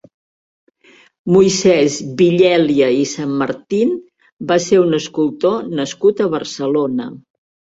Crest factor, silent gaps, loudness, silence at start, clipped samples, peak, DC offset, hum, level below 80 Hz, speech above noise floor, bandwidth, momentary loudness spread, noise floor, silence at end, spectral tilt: 16 dB; 4.32-4.37 s; -15 LUFS; 1.25 s; under 0.1%; 0 dBFS; under 0.1%; none; -56 dBFS; 35 dB; 8 kHz; 9 LU; -49 dBFS; 0.55 s; -5 dB/octave